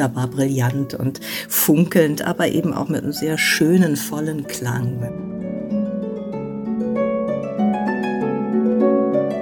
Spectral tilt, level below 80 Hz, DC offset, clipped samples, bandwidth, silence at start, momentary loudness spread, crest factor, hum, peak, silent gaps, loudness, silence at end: -5.5 dB/octave; -54 dBFS; under 0.1%; under 0.1%; 17.5 kHz; 0 s; 12 LU; 18 dB; none; -2 dBFS; none; -20 LUFS; 0 s